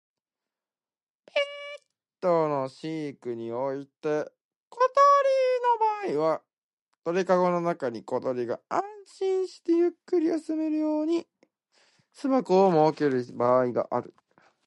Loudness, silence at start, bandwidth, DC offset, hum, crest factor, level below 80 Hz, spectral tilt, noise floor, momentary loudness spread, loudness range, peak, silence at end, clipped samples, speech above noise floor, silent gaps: -26 LUFS; 1.35 s; 11 kHz; under 0.1%; none; 18 dB; -80 dBFS; -6.5 dB/octave; under -90 dBFS; 13 LU; 6 LU; -10 dBFS; 0.6 s; under 0.1%; over 64 dB; 4.41-4.71 s, 6.53-6.87 s